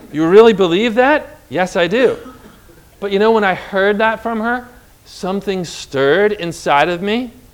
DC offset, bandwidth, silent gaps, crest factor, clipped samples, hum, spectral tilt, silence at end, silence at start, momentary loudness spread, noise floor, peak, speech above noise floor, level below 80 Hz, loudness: under 0.1%; 16 kHz; none; 16 dB; 0.3%; none; -5 dB/octave; 0.25 s; 0.05 s; 12 LU; -44 dBFS; 0 dBFS; 29 dB; -48 dBFS; -14 LUFS